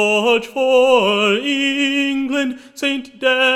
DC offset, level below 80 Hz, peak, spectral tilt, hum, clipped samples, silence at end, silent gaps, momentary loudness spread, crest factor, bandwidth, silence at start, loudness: under 0.1%; -58 dBFS; -2 dBFS; -3.5 dB/octave; none; under 0.1%; 0 s; none; 8 LU; 14 dB; 14.5 kHz; 0 s; -16 LUFS